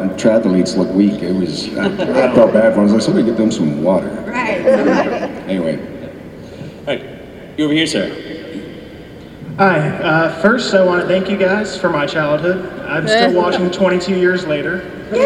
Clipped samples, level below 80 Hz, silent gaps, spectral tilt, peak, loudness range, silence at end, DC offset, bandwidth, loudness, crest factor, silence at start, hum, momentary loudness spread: under 0.1%; -46 dBFS; none; -6 dB/octave; 0 dBFS; 7 LU; 0 s; under 0.1%; 11.5 kHz; -15 LUFS; 14 dB; 0 s; none; 17 LU